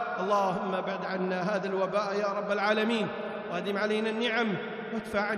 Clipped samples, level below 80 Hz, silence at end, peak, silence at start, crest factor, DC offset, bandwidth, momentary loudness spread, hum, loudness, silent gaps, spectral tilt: under 0.1%; -68 dBFS; 0 s; -14 dBFS; 0 s; 16 dB; under 0.1%; 13 kHz; 7 LU; none; -30 LUFS; none; -5.5 dB/octave